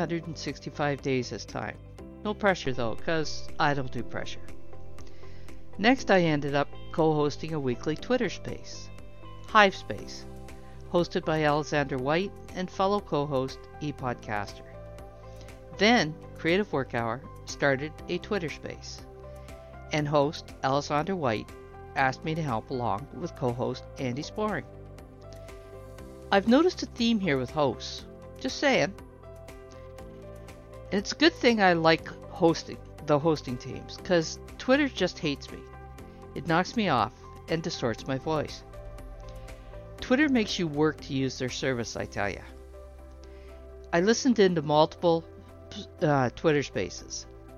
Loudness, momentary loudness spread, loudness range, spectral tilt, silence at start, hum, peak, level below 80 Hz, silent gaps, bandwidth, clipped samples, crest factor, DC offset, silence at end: -28 LUFS; 23 LU; 6 LU; -5 dB/octave; 0 s; none; -4 dBFS; -50 dBFS; none; 13.5 kHz; under 0.1%; 24 dB; under 0.1%; 0 s